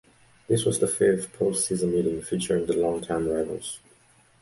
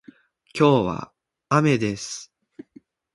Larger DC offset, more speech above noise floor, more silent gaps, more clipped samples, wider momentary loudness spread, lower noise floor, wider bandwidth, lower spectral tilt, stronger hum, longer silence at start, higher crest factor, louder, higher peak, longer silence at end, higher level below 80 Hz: neither; about the same, 34 dB vs 33 dB; neither; neither; second, 8 LU vs 18 LU; first, -59 dBFS vs -53 dBFS; about the same, 11.5 kHz vs 11.5 kHz; about the same, -5 dB/octave vs -6 dB/octave; neither; about the same, 0.5 s vs 0.55 s; second, 16 dB vs 22 dB; second, -25 LUFS vs -21 LUFS; second, -10 dBFS vs -4 dBFS; second, 0.65 s vs 0.9 s; about the same, -54 dBFS vs -56 dBFS